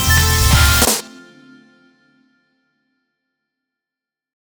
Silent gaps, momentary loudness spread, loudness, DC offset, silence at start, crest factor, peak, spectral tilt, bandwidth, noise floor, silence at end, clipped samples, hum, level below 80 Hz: none; 5 LU; -13 LUFS; under 0.1%; 0 s; 18 dB; 0 dBFS; -3 dB/octave; over 20 kHz; -87 dBFS; 3.55 s; under 0.1%; none; -26 dBFS